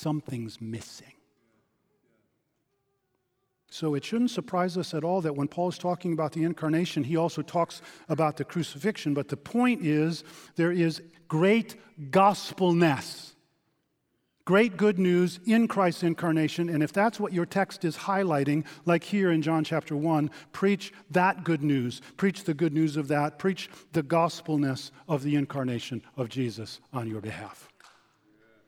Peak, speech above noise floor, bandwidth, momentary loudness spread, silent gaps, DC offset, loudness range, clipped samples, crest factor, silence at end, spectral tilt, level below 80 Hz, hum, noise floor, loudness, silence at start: -8 dBFS; 50 dB; 16 kHz; 13 LU; none; under 0.1%; 7 LU; under 0.1%; 20 dB; 1.15 s; -6.5 dB/octave; -72 dBFS; none; -77 dBFS; -27 LUFS; 0 s